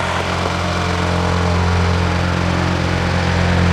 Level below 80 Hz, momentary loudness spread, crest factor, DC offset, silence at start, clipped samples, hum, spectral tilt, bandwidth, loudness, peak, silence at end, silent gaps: -30 dBFS; 3 LU; 12 dB; under 0.1%; 0 s; under 0.1%; none; -5.5 dB/octave; 10.5 kHz; -17 LUFS; -4 dBFS; 0 s; none